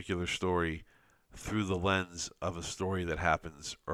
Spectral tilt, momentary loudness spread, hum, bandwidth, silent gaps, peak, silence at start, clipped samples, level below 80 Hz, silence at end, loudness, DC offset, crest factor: -4.5 dB/octave; 11 LU; none; 14.5 kHz; none; -12 dBFS; 0 s; under 0.1%; -54 dBFS; 0 s; -34 LUFS; under 0.1%; 22 dB